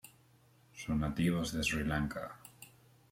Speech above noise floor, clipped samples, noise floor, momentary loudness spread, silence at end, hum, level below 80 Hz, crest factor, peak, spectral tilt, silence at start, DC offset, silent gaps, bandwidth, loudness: 31 dB; under 0.1%; -66 dBFS; 22 LU; 0.45 s; none; -52 dBFS; 18 dB; -20 dBFS; -5 dB/octave; 0.05 s; under 0.1%; none; 16.5 kHz; -35 LUFS